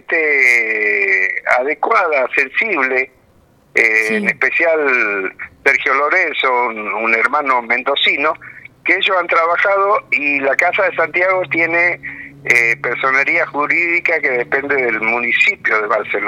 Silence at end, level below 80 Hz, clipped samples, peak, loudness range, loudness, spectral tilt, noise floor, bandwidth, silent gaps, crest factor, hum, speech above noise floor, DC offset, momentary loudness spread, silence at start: 0 s; -60 dBFS; under 0.1%; 0 dBFS; 1 LU; -14 LUFS; -3.5 dB/octave; -51 dBFS; 16.5 kHz; none; 16 dB; none; 36 dB; under 0.1%; 5 LU; 0.1 s